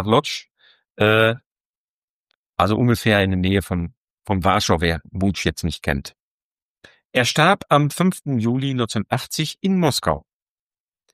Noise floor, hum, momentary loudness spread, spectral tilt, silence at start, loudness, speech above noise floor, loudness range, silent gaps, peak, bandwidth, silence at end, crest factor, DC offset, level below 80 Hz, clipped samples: under -90 dBFS; none; 11 LU; -5 dB/octave; 0 s; -20 LUFS; over 71 dB; 3 LU; 0.51-0.55 s, 0.90-0.95 s, 1.46-2.25 s, 2.35-2.53 s, 3.97-4.17 s, 6.20-6.76 s, 7.05-7.10 s; -2 dBFS; 15.5 kHz; 0.95 s; 20 dB; under 0.1%; -42 dBFS; under 0.1%